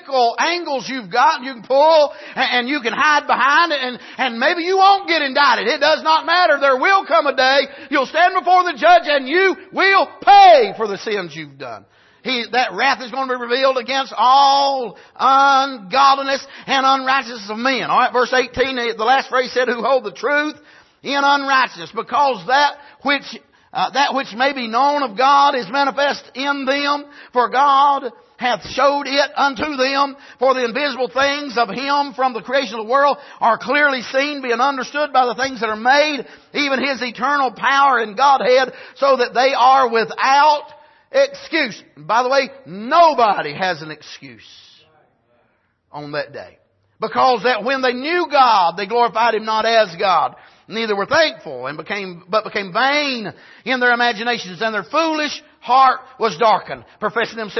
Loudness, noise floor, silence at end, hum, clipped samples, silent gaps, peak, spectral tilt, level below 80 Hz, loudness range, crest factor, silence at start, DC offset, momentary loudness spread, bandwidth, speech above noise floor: -16 LUFS; -63 dBFS; 0 s; none; under 0.1%; none; -2 dBFS; -3 dB/octave; -60 dBFS; 5 LU; 16 dB; 0.05 s; under 0.1%; 11 LU; 6.2 kHz; 46 dB